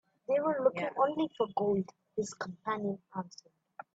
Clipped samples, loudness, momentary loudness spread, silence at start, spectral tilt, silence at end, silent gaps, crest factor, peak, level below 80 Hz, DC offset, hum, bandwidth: under 0.1%; -33 LUFS; 12 LU; 0.3 s; -6 dB/octave; 0.65 s; none; 20 dB; -14 dBFS; -76 dBFS; under 0.1%; none; 8 kHz